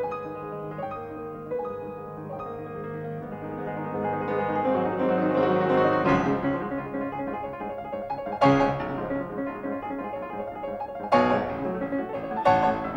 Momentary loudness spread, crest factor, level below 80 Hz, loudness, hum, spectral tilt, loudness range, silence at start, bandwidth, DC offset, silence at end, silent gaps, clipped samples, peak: 14 LU; 20 dB; -52 dBFS; -27 LUFS; none; -8 dB/octave; 10 LU; 0 s; 7.6 kHz; under 0.1%; 0 s; none; under 0.1%; -6 dBFS